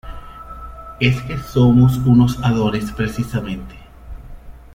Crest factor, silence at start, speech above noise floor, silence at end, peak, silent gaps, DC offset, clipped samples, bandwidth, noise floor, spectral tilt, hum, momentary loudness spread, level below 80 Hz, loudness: 16 dB; 0.05 s; 20 dB; 0.15 s; -2 dBFS; none; under 0.1%; under 0.1%; 16 kHz; -36 dBFS; -7.5 dB/octave; none; 23 LU; -36 dBFS; -17 LUFS